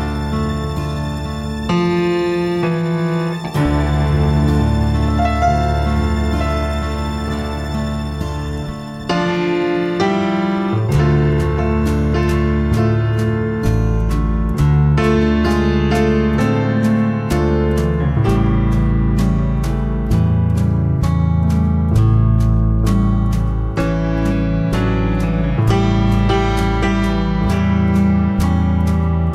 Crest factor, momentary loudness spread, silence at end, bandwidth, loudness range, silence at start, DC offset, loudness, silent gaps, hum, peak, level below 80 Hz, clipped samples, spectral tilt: 12 dB; 6 LU; 0 s; 14 kHz; 3 LU; 0 s; under 0.1%; -17 LUFS; none; none; -2 dBFS; -22 dBFS; under 0.1%; -7.5 dB/octave